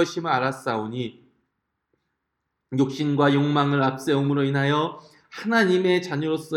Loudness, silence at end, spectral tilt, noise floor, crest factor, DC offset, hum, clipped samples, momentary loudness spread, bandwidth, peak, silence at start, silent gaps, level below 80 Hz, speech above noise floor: -23 LUFS; 0 s; -6.5 dB/octave; -79 dBFS; 18 dB; under 0.1%; none; under 0.1%; 11 LU; 13 kHz; -6 dBFS; 0 s; none; -70 dBFS; 57 dB